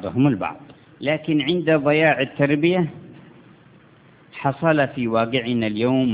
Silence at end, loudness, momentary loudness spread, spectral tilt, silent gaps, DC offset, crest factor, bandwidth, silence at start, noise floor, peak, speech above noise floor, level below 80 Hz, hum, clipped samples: 0 s; -20 LUFS; 9 LU; -10.5 dB/octave; none; under 0.1%; 18 dB; 4 kHz; 0 s; -51 dBFS; -4 dBFS; 31 dB; -56 dBFS; none; under 0.1%